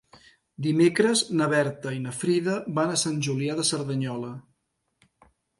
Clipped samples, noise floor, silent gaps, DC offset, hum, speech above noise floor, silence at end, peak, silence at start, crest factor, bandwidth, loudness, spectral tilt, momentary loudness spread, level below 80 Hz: under 0.1%; -76 dBFS; none; under 0.1%; none; 51 dB; 1.2 s; -8 dBFS; 0.6 s; 18 dB; 11.5 kHz; -25 LUFS; -4.5 dB/octave; 10 LU; -68 dBFS